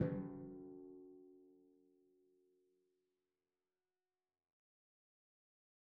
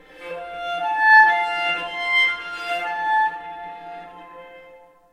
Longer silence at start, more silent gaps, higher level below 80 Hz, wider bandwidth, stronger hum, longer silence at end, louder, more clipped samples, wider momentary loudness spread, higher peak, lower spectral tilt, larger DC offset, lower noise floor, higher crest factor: second, 0 s vs 0.15 s; neither; second, -76 dBFS vs -64 dBFS; second, 2.6 kHz vs 12.5 kHz; neither; first, 4.15 s vs 0.35 s; second, -50 LUFS vs -18 LUFS; neither; about the same, 21 LU vs 23 LU; second, -24 dBFS vs -2 dBFS; first, -8.5 dB/octave vs -1.5 dB/octave; neither; first, under -90 dBFS vs -48 dBFS; first, 28 dB vs 20 dB